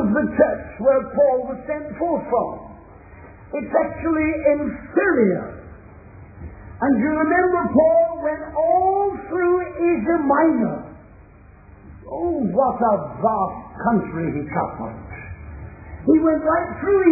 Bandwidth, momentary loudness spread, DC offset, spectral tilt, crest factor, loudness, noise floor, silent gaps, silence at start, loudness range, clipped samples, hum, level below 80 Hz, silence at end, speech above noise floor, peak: 2.6 kHz; 18 LU; under 0.1%; -15 dB/octave; 18 dB; -20 LUFS; -46 dBFS; none; 0 s; 4 LU; under 0.1%; none; -44 dBFS; 0 s; 26 dB; -2 dBFS